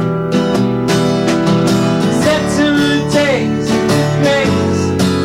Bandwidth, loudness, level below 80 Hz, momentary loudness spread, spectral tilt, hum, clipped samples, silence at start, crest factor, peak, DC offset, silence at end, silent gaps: 16.5 kHz; -13 LUFS; -38 dBFS; 2 LU; -5.5 dB/octave; none; under 0.1%; 0 s; 12 dB; -2 dBFS; under 0.1%; 0 s; none